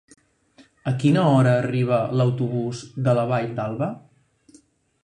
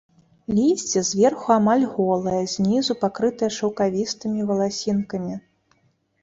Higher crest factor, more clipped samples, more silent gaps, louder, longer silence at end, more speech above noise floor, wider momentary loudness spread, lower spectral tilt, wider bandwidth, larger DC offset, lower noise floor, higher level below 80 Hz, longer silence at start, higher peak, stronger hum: about the same, 18 dB vs 18 dB; neither; neither; about the same, -22 LUFS vs -22 LUFS; first, 1.05 s vs 0.85 s; second, 35 dB vs 44 dB; first, 12 LU vs 7 LU; first, -8 dB/octave vs -5 dB/octave; first, 10 kHz vs 7.8 kHz; neither; second, -56 dBFS vs -65 dBFS; about the same, -60 dBFS vs -58 dBFS; first, 0.85 s vs 0.5 s; about the same, -6 dBFS vs -4 dBFS; neither